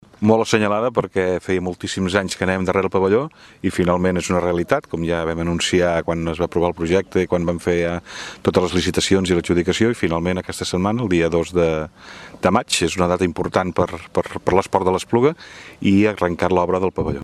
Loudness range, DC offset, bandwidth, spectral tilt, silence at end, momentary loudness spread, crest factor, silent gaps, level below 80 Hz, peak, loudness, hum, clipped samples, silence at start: 1 LU; under 0.1%; 13.5 kHz; -5.5 dB/octave; 0 s; 6 LU; 20 dB; none; -42 dBFS; 0 dBFS; -19 LUFS; none; under 0.1%; 0.2 s